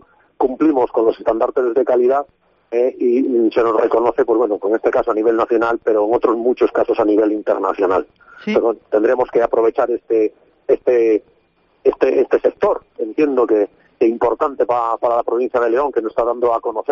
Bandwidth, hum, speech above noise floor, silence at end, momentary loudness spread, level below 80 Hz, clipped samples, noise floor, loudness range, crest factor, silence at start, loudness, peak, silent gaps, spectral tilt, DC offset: 7 kHz; none; 43 dB; 0 s; 5 LU; -54 dBFS; under 0.1%; -59 dBFS; 2 LU; 14 dB; 0.4 s; -17 LUFS; -2 dBFS; none; -4.5 dB/octave; under 0.1%